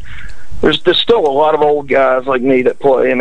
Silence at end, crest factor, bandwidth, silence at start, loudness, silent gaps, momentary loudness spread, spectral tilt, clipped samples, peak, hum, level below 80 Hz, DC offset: 0 s; 12 dB; 9.8 kHz; 0 s; -12 LUFS; none; 3 LU; -6 dB/octave; under 0.1%; 0 dBFS; none; -38 dBFS; under 0.1%